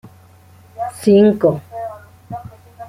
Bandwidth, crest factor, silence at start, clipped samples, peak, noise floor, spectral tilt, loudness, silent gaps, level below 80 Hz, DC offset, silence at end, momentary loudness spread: 15 kHz; 18 dB; 0.05 s; under 0.1%; -2 dBFS; -46 dBFS; -7.5 dB/octave; -15 LUFS; none; -56 dBFS; under 0.1%; 0 s; 21 LU